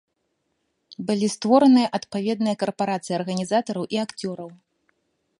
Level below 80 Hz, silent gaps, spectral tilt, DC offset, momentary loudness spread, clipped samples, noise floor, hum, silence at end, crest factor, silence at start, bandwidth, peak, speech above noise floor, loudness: -70 dBFS; none; -5.5 dB/octave; under 0.1%; 15 LU; under 0.1%; -74 dBFS; none; 0.85 s; 20 dB; 0.9 s; 11 kHz; -4 dBFS; 52 dB; -22 LUFS